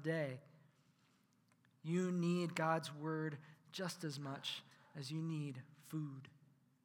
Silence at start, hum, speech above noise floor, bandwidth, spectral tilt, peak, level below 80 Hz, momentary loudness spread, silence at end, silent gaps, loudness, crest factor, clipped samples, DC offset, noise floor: 0 s; none; 33 dB; 17.5 kHz; -6 dB/octave; -24 dBFS; under -90 dBFS; 17 LU; 0.6 s; none; -43 LUFS; 20 dB; under 0.1%; under 0.1%; -75 dBFS